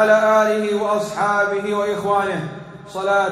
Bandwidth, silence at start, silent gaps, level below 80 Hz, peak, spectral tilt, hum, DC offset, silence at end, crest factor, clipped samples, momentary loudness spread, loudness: 14.5 kHz; 0 s; none; -60 dBFS; -4 dBFS; -5 dB/octave; none; under 0.1%; 0 s; 16 dB; under 0.1%; 13 LU; -19 LUFS